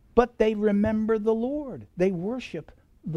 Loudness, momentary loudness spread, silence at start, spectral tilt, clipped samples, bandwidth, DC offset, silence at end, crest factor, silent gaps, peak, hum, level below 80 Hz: -26 LUFS; 15 LU; 0.15 s; -8 dB/octave; under 0.1%; 7.4 kHz; under 0.1%; 0 s; 20 dB; none; -6 dBFS; none; -48 dBFS